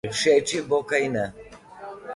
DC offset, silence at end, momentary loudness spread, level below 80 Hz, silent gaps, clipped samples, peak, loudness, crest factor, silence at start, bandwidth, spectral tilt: under 0.1%; 0 s; 20 LU; -58 dBFS; none; under 0.1%; -8 dBFS; -23 LUFS; 18 dB; 0.05 s; 11.5 kHz; -3.5 dB/octave